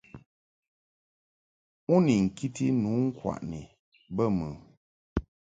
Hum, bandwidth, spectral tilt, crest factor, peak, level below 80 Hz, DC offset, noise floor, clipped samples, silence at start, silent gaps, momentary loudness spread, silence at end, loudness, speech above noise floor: none; 9.2 kHz; -7.5 dB/octave; 20 dB; -10 dBFS; -50 dBFS; under 0.1%; under -90 dBFS; under 0.1%; 0.15 s; 0.26-0.62 s, 0.68-1.87 s, 3.79-3.92 s, 4.77-5.16 s; 16 LU; 0.35 s; -29 LUFS; over 63 dB